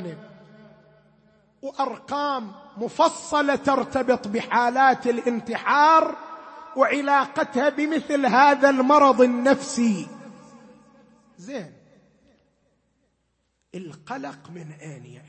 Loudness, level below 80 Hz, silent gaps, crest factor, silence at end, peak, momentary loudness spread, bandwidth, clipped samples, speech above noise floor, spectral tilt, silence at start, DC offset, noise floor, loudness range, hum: -21 LUFS; -66 dBFS; none; 20 dB; 0.15 s; -4 dBFS; 23 LU; 8.8 kHz; under 0.1%; 50 dB; -4.5 dB/octave; 0 s; under 0.1%; -72 dBFS; 19 LU; none